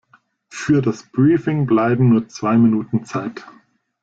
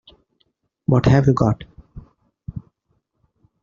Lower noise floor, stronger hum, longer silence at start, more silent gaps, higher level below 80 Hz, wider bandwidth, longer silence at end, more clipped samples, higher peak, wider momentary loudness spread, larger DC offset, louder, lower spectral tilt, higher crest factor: second, -56 dBFS vs -70 dBFS; neither; second, 0.55 s vs 0.9 s; neither; second, -56 dBFS vs -42 dBFS; first, 8 kHz vs 7.2 kHz; second, 0.6 s vs 1 s; neither; about the same, -4 dBFS vs -2 dBFS; second, 13 LU vs 24 LU; neither; about the same, -17 LUFS vs -18 LUFS; about the same, -8 dB/octave vs -8.5 dB/octave; second, 14 dB vs 20 dB